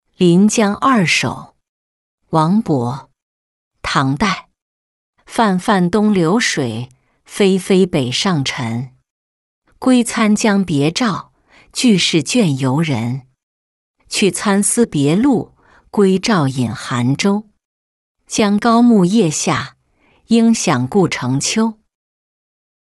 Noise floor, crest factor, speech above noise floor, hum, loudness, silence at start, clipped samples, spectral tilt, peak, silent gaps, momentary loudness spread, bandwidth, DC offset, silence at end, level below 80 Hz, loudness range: -56 dBFS; 14 dB; 42 dB; none; -15 LUFS; 0.2 s; under 0.1%; -5 dB/octave; -2 dBFS; 1.69-2.18 s, 3.22-3.71 s, 4.62-5.13 s, 9.10-9.62 s, 13.43-13.94 s, 17.65-18.15 s; 11 LU; 12 kHz; under 0.1%; 1.1 s; -50 dBFS; 4 LU